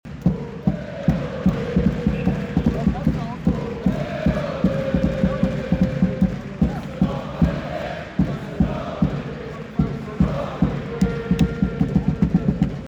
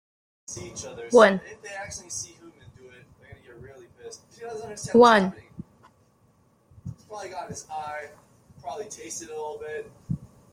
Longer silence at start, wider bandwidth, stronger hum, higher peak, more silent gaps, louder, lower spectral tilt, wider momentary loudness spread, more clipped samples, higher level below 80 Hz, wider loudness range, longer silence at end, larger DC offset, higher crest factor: second, 0.05 s vs 0.5 s; second, 8.2 kHz vs 15 kHz; neither; about the same, -6 dBFS vs -4 dBFS; neither; about the same, -23 LUFS vs -24 LUFS; first, -8.5 dB/octave vs -4.5 dB/octave; second, 4 LU vs 27 LU; neither; first, -32 dBFS vs -60 dBFS; second, 2 LU vs 15 LU; second, 0 s vs 0.25 s; neither; second, 16 dB vs 24 dB